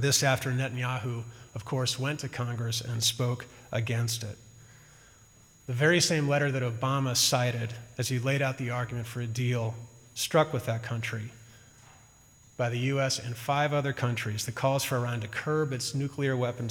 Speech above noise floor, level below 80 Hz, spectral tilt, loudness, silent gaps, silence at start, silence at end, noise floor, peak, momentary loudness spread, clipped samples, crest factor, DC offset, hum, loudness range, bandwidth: 28 dB; -64 dBFS; -4 dB/octave; -29 LUFS; none; 0 s; 0 s; -57 dBFS; -12 dBFS; 12 LU; under 0.1%; 18 dB; under 0.1%; none; 5 LU; 17.5 kHz